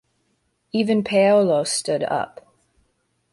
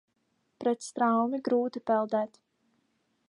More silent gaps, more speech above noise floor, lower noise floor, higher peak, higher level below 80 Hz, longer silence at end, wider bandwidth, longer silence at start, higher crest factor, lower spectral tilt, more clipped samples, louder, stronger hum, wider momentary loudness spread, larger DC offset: neither; about the same, 50 dB vs 47 dB; second, -69 dBFS vs -75 dBFS; first, -6 dBFS vs -14 dBFS; first, -64 dBFS vs -84 dBFS; about the same, 1.05 s vs 1.05 s; about the same, 11.5 kHz vs 11 kHz; first, 0.75 s vs 0.6 s; about the same, 16 dB vs 16 dB; about the same, -4.5 dB/octave vs -5.5 dB/octave; neither; first, -20 LUFS vs -29 LUFS; neither; first, 11 LU vs 6 LU; neither